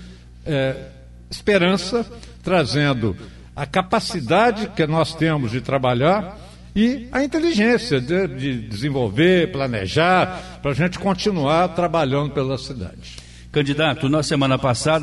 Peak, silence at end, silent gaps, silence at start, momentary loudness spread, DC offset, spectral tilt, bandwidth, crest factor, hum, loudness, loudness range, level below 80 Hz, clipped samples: -4 dBFS; 0 s; none; 0 s; 14 LU; under 0.1%; -6 dB/octave; 11.5 kHz; 16 dB; 60 Hz at -40 dBFS; -20 LUFS; 2 LU; -42 dBFS; under 0.1%